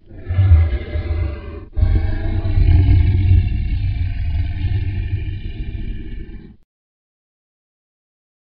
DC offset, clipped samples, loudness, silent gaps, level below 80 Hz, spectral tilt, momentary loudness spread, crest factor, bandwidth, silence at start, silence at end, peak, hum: under 0.1%; under 0.1%; -19 LUFS; none; -22 dBFS; -8 dB/octave; 16 LU; 16 dB; 4.8 kHz; 0.1 s; 2.05 s; -2 dBFS; none